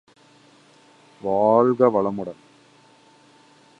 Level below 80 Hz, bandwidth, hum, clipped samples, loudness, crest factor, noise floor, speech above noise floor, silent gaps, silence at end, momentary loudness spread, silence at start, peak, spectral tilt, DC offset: -66 dBFS; 9.2 kHz; none; under 0.1%; -20 LUFS; 22 dB; -54 dBFS; 35 dB; none; 1.45 s; 16 LU; 1.25 s; -2 dBFS; -9 dB/octave; under 0.1%